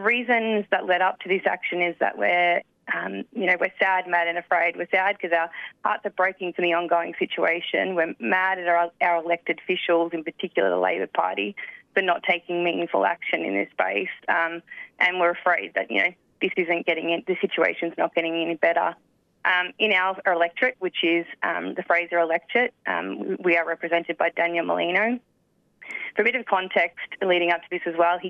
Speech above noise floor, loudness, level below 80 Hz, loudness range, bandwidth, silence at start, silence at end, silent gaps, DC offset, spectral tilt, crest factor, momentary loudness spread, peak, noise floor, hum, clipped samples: 43 dB; -23 LUFS; -78 dBFS; 2 LU; 6.6 kHz; 0 s; 0 s; none; under 0.1%; -6 dB/octave; 18 dB; 7 LU; -6 dBFS; -67 dBFS; none; under 0.1%